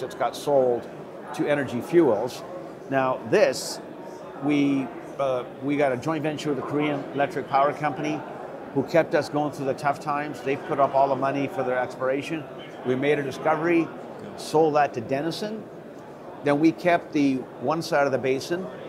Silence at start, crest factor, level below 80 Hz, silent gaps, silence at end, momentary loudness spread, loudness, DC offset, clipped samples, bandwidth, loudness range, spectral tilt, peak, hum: 0 s; 18 dB; -66 dBFS; none; 0 s; 15 LU; -25 LUFS; under 0.1%; under 0.1%; 15.5 kHz; 2 LU; -6 dB/octave; -6 dBFS; none